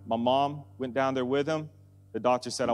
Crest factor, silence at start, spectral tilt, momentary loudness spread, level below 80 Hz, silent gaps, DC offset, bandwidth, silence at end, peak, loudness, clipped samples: 18 dB; 0 s; -5 dB/octave; 10 LU; -72 dBFS; none; under 0.1%; 12 kHz; 0 s; -12 dBFS; -29 LUFS; under 0.1%